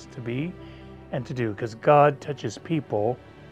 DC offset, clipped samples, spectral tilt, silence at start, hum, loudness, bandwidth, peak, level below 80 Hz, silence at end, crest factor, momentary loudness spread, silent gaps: under 0.1%; under 0.1%; -7 dB/octave; 0 s; none; -25 LUFS; 9 kHz; -4 dBFS; -56 dBFS; 0.05 s; 22 dB; 18 LU; none